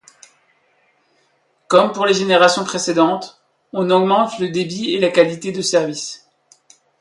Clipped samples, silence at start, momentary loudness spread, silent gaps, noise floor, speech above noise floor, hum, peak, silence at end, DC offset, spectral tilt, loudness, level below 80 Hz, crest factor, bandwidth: under 0.1%; 1.7 s; 13 LU; none; -62 dBFS; 46 dB; none; 0 dBFS; 0.85 s; under 0.1%; -4 dB/octave; -16 LUFS; -64 dBFS; 18 dB; 11.5 kHz